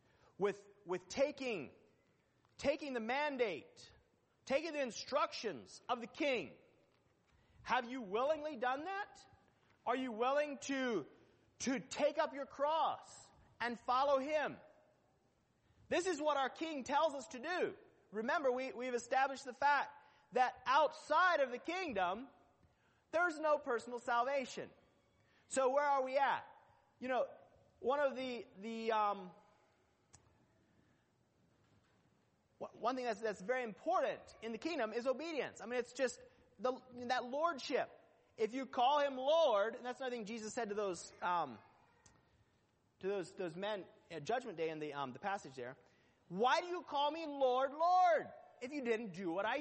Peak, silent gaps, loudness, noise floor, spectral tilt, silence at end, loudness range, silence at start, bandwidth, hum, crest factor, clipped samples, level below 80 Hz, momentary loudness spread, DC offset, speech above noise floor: -20 dBFS; none; -39 LUFS; -77 dBFS; -3.5 dB/octave; 0 s; 7 LU; 0.4 s; 8.4 kHz; none; 18 dB; under 0.1%; -78 dBFS; 13 LU; under 0.1%; 38 dB